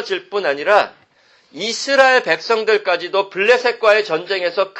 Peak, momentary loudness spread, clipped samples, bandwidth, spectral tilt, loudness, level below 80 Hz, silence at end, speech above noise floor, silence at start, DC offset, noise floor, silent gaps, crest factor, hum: 0 dBFS; 9 LU; under 0.1%; 8.8 kHz; -2 dB/octave; -16 LUFS; -68 dBFS; 0 s; 38 dB; 0 s; under 0.1%; -54 dBFS; none; 16 dB; none